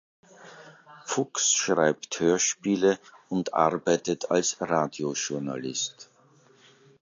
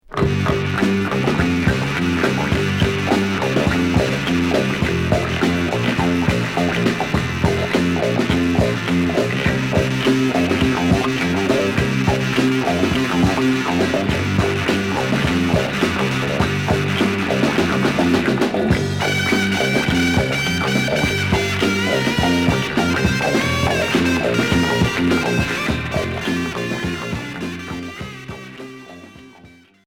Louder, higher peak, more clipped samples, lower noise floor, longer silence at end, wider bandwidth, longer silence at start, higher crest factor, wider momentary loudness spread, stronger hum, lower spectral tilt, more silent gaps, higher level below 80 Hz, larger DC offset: second, -26 LUFS vs -18 LUFS; second, -6 dBFS vs -2 dBFS; neither; first, -59 dBFS vs -46 dBFS; first, 0.95 s vs 0.4 s; second, 7.8 kHz vs 17.5 kHz; first, 0.4 s vs 0.1 s; first, 22 dB vs 16 dB; first, 9 LU vs 5 LU; neither; second, -3 dB/octave vs -5.5 dB/octave; neither; second, -68 dBFS vs -36 dBFS; neither